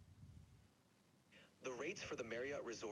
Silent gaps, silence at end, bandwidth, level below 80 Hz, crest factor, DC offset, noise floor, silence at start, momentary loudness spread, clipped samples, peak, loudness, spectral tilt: none; 0 s; 12 kHz; -76 dBFS; 16 dB; under 0.1%; -74 dBFS; 0 s; 21 LU; under 0.1%; -34 dBFS; -48 LUFS; -4 dB/octave